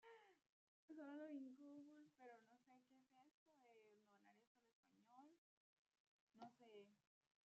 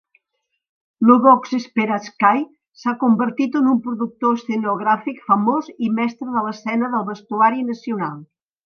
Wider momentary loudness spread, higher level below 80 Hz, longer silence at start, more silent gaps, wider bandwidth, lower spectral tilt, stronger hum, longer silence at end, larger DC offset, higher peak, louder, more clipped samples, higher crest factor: about the same, 11 LU vs 11 LU; second, under -90 dBFS vs -72 dBFS; second, 0 s vs 1 s; first, 0.49-0.88 s, 3.31-3.46 s, 4.47-4.55 s, 4.73-4.83 s, 5.38-5.85 s, 6.00-6.27 s vs 2.68-2.72 s; first, 7.4 kHz vs 6.6 kHz; second, -4 dB/octave vs -7 dB/octave; neither; about the same, 0.45 s vs 0.4 s; neither; second, -48 dBFS vs 0 dBFS; second, -62 LUFS vs -19 LUFS; neither; about the same, 18 dB vs 18 dB